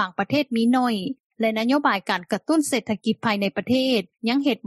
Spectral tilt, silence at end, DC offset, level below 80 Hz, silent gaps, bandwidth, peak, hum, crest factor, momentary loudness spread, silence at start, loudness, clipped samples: -4.5 dB/octave; 0.1 s; under 0.1%; -68 dBFS; 1.20-1.30 s; 13 kHz; -6 dBFS; none; 16 dB; 5 LU; 0 s; -23 LUFS; under 0.1%